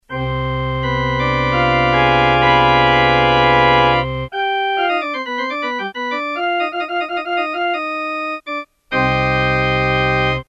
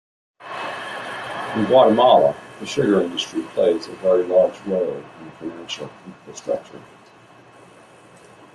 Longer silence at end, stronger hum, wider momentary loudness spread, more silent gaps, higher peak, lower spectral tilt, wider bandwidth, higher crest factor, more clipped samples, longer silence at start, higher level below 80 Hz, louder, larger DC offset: second, 0.05 s vs 1.75 s; neither; second, 10 LU vs 20 LU; neither; about the same, 0 dBFS vs -2 dBFS; first, -6.5 dB/octave vs -5 dB/octave; second, 7.8 kHz vs 12 kHz; about the same, 16 dB vs 18 dB; neither; second, 0.1 s vs 0.4 s; first, -34 dBFS vs -64 dBFS; first, -16 LUFS vs -20 LUFS; neither